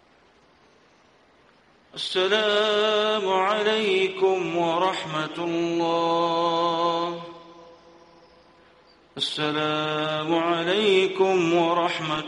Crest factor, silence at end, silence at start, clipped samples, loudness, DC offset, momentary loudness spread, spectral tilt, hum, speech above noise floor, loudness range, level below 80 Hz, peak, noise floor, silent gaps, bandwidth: 18 dB; 0 s; 1.95 s; under 0.1%; -23 LUFS; under 0.1%; 7 LU; -4.5 dB/octave; none; 35 dB; 6 LU; -68 dBFS; -6 dBFS; -58 dBFS; none; 10.5 kHz